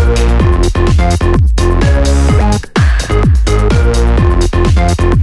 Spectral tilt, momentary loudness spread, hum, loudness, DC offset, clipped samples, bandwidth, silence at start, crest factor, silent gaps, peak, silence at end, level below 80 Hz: -6.5 dB/octave; 1 LU; none; -11 LUFS; under 0.1%; under 0.1%; 12 kHz; 0 s; 8 dB; none; 0 dBFS; 0 s; -10 dBFS